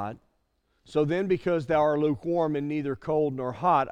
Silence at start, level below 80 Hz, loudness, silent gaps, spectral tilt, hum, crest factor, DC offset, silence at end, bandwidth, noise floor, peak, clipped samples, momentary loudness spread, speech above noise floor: 0 s; -60 dBFS; -27 LUFS; none; -8 dB/octave; none; 16 dB; under 0.1%; 0 s; 9.4 kHz; -72 dBFS; -10 dBFS; under 0.1%; 6 LU; 46 dB